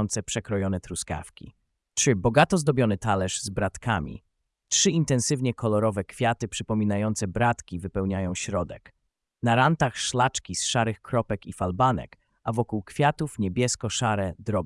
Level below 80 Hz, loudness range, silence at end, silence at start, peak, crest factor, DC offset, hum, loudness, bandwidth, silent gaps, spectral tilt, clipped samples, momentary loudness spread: -50 dBFS; 2 LU; 0 s; 0 s; -6 dBFS; 20 dB; under 0.1%; none; -26 LUFS; 12 kHz; none; -4.5 dB/octave; under 0.1%; 10 LU